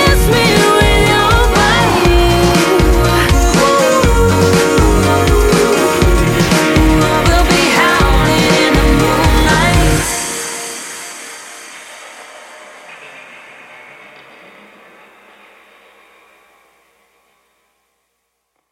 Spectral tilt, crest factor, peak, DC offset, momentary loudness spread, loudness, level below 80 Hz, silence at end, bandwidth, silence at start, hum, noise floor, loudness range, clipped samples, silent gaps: -4.5 dB/octave; 12 dB; 0 dBFS; under 0.1%; 18 LU; -11 LUFS; -20 dBFS; 5.55 s; 16.5 kHz; 0 s; none; -68 dBFS; 15 LU; under 0.1%; none